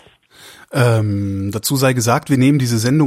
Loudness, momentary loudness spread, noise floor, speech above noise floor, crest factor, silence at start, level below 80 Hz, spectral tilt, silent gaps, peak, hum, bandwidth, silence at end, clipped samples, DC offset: -16 LUFS; 6 LU; -45 dBFS; 30 dB; 14 dB; 0.45 s; -52 dBFS; -5.5 dB/octave; none; -2 dBFS; none; 15.5 kHz; 0 s; under 0.1%; under 0.1%